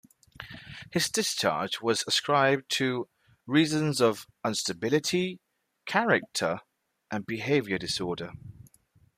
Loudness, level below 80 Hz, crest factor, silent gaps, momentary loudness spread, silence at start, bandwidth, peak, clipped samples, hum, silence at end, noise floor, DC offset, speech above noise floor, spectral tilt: -28 LUFS; -66 dBFS; 20 dB; none; 18 LU; 0.4 s; 15.5 kHz; -10 dBFS; under 0.1%; none; 0.55 s; -63 dBFS; under 0.1%; 36 dB; -3.5 dB/octave